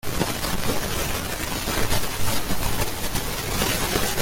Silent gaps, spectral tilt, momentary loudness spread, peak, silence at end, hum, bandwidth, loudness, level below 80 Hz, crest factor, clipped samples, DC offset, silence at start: none; -3 dB/octave; 4 LU; -6 dBFS; 0 s; none; 17 kHz; -25 LUFS; -32 dBFS; 18 dB; under 0.1%; under 0.1%; 0.05 s